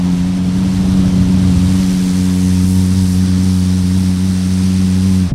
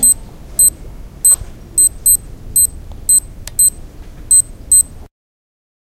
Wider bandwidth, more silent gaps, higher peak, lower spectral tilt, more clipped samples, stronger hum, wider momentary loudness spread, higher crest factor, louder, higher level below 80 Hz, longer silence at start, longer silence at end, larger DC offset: second, 13.5 kHz vs 17.5 kHz; neither; about the same, 0 dBFS vs 0 dBFS; first, -7 dB/octave vs -0.5 dB/octave; neither; neither; second, 3 LU vs 8 LU; about the same, 12 dB vs 14 dB; about the same, -13 LUFS vs -11 LUFS; about the same, -28 dBFS vs -32 dBFS; about the same, 0 s vs 0 s; second, 0 s vs 0.85 s; neither